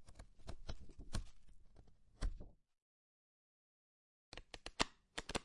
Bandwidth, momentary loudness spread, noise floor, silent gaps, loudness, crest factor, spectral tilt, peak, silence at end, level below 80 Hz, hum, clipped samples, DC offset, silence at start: 11.5 kHz; 19 LU; under -90 dBFS; 2.82-4.32 s; -48 LUFS; 38 dB; -3 dB/octave; -12 dBFS; 0 s; -54 dBFS; none; under 0.1%; under 0.1%; 0 s